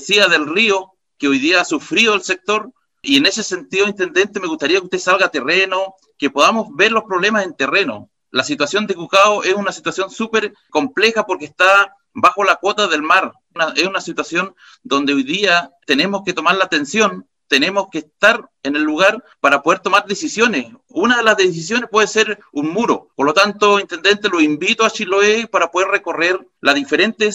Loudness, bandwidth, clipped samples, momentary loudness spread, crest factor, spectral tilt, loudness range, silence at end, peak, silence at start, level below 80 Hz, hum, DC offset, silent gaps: -15 LUFS; 15 kHz; under 0.1%; 8 LU; 16 dB; -2.5 dB/octave; 2 LU; 0 s; 0 dBFS; 0 s; -60 dBFS; none; under 0.1%; none